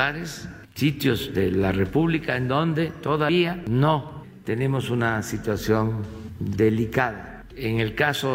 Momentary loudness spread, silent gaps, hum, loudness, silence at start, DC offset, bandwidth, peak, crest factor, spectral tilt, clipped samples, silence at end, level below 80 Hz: 11 LU; none; none; -24 LUFS; 0 s; under 0.1%; 16 kHz; -4 dBFS; 20 dB; -6.5 dB/octave; under 0.1%; 0 s; -46 dBFS